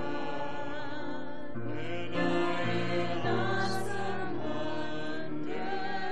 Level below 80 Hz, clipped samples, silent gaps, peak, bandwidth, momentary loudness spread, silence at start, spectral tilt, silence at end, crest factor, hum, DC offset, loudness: -62 dBFS; under 0.1%; none; -18 dBFS; 10.5 kHz; 8 LU; 0 s; -6 dB/octave; 0 s; 16 dB; none; 3%; -34 LUFS